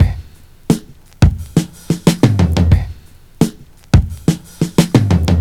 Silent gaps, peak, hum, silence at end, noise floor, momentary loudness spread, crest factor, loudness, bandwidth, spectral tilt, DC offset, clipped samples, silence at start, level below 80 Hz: none; 0 dBFS; none; 0 s; -37 dBFS; 7 LU; 14 dB; -15 LUFS; 16 kHz; -6.5 dB/octave; under 0.1%; under 0.1%; 0 s; -24 dBFS